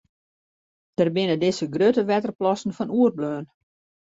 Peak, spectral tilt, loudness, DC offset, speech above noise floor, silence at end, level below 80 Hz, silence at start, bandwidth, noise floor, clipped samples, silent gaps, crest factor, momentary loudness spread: -8 dBFS; -6.5 dB/octave; -23 LUFS; under 0.1%; over 68 dB; 0.6 s; -66 dBFS; 1 s; 8 kHz; under -90 dBFS; under 0.1%; 2.35-2.39 s; 16 dB; 9 LU